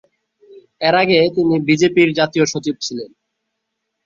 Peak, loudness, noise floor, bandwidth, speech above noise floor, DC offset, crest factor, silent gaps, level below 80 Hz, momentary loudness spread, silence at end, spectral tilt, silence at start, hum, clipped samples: -2 dBFS; -15 LUFS; -75 dBFS; 7.6 kHz; 60 dB; under 0.1%; 16 dB; none; -58 dBFS; 12 LU; 1 s; -5 dB/octave; 0.55 s; none; under 0.1%